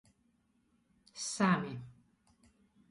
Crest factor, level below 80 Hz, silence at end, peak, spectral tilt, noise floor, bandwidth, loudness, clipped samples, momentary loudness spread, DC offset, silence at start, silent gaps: 22 dB; -74 dBFS; 1 s; -18 dBFS; -4.5 dB/octave; -74 dBFS; 11.5 kHz; -34 LUFS; under 0.1%; 23 LU; under 0.1%; 1.15 s; none